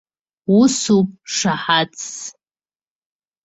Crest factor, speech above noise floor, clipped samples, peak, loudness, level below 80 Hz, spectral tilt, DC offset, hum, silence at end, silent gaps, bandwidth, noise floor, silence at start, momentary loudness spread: 18 dB; over 73 dB; under 0.1%; -2 dBFS; -17 LUFS; -60 dBFS; -4 dB/octave; under 0.1%; none; 1.15 s; none; 8.2 kHz; under -90 dBFS; 0.5 s; 16 LU